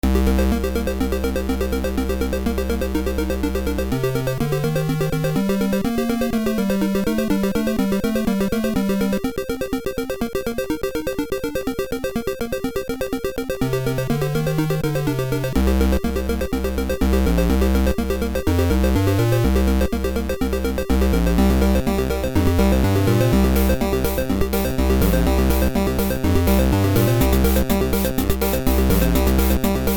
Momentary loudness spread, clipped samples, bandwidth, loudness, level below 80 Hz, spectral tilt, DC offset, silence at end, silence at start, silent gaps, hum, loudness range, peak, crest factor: 7 LU; under 0.1%; over 20 kHz; -20 LUFS; -24 dBFS; -6.5 dB/octave; under 0.1%; 0 s; 0.05 s; none; none; 5 LU; -4 dBFS; 14 dB